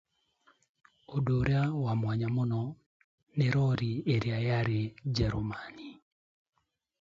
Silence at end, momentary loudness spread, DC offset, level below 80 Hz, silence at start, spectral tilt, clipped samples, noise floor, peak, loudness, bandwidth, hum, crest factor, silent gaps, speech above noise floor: 1.1 s; 12 LU; under 0.1%; -52 dBFS; 1.1 s; -8 dB/octave; under 0.1%; -69 dBFS; -16 dBFS; -31 LUFS; 7.4 kHz; none; 16 dB; 2.86-3.27 s; 39 dB